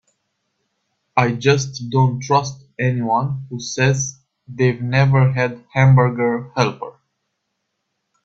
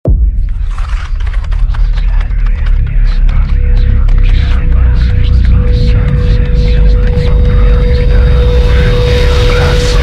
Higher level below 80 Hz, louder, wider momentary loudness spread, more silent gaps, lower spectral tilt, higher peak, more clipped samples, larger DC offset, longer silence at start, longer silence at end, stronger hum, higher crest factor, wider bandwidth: second, -52 dBFS vs -8 dBFS; second, -18 LUFS vs -11 LUFS; first, 12 LU vs 7 LU; neither; about the same, -6 dB/octave vs -7 dB/octave; about the same, 0 dBFS vs 0 dBFS; neither; neither; first, 1.15 s vs 0.05 s; first, 1.35 s vs 0 s; neither; first, 18 dB vs 6 dB; about the same, 7.8 kHz vs 8 kHz